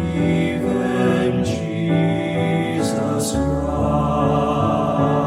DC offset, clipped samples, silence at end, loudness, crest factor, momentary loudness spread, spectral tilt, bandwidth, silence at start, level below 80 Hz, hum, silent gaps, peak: under 0.1%; under 0.1%; 0 s; -19 LUFS; 14 dB; 3 LU; -6.5 dB/octave; 15 kHz; 0 s; -36 dBFS; none; none; -4 dBFS